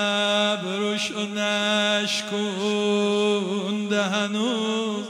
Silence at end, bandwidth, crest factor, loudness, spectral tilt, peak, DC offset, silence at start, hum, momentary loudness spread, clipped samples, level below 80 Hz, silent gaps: 0 s; 14 kHz; 14 dB; -23 LUFS; -3.5 dB/octave; -8 dBFS; under 0.1%; 0 s; none; 5 LU; under 0.1%; -76 dBFS; none